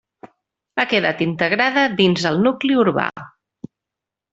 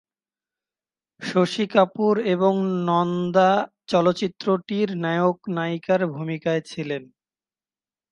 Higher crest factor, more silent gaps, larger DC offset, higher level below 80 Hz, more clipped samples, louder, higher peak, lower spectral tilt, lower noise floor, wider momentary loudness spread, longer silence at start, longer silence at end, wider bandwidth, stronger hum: about the same, 18 dB vs 20 dB; neither; neither; first, -60 dBFS vs -68 dBFS; neither; first, -18 LUFS vs -22 LUFS; about the same, -2 dBFS vs -4 dBFS; about the same, -5.5 dB/octave vs -6.5 dB/octave; second, -85 dBFS vs under -90 dBFS; about the same, 8 LU vs 8 LU; second, 0.25 s vs 1.2 s; about the same, 1.05 s vs 1.1 s; second, 8 kHz vs 11 kHz; neither